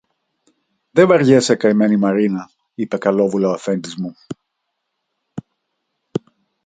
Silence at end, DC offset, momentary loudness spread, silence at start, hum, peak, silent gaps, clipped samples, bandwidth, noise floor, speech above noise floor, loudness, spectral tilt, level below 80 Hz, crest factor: 0.45 s; under 0.1%; 23 LU; 0.95 s; none; 0 dBFS; none; under 0.1%; 9.4 kHz; -75 dBFS; 59 dB; -16 LUFS; -6 dB/octave; -62 dBFS; 18 dB